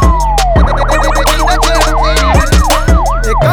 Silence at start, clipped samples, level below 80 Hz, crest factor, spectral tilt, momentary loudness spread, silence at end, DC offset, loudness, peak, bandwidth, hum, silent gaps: 0 s; under 0.1%; -10 dBFS; 8 dB; -4.5 dB/octave; 2 LU; 0 s; under 0.1%; -10 LUFS; 0 dBFS; 19.5 kHz; none; none